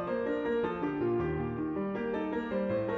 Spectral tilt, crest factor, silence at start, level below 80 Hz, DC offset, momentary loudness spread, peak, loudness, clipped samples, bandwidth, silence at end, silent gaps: -9 dB/octave; 10 dB; 0 s; -54 dBFS; under 0.1%; 3 LU; -22 dBFS; -33 LUFS; under 0.1%; 6.2 kHz; 0 s; none